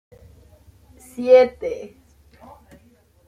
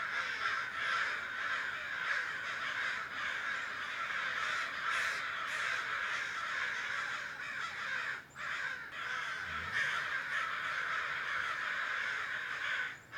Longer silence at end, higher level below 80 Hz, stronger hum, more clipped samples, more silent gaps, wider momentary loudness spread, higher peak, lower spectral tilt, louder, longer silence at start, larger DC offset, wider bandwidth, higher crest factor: first, 1.4 s vs 0 s; first, -56 dBFS vs -72 dBFS; neither; neither; neither; first, 25 LU vs 5 LU; first, -2 dBFS vs -22 dBFS; first, -5 dB/octave vs -1 dB/octave; first, -17 LUFS vs -36 LUFS; first, 1.2 s vs 0 s; neither; second, 11.5 kHz vs 19 kHz; about the same, 20 dB vs 16 dB